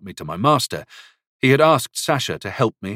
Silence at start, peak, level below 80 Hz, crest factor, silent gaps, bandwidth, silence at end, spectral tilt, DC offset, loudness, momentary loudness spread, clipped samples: 0.05 s; -2 dBFS; -58 dBFS; 18 dB; 1.27-1.39 s; 16.5 kHz; 0 s; -4.5 dB/octave; under 0.1%; -19 LUFS; 11 LU; under 0.1%